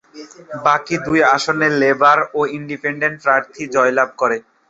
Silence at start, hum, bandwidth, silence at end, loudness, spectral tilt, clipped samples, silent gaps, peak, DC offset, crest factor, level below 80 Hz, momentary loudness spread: 0.15 s; none; 8 kHz; 0.3 s; -16 LUFS; -4.5 dB/octave; under 0.1%; none; 0 dBFS; under 0.1%; 16 dB; -56 dBFS; 8 LU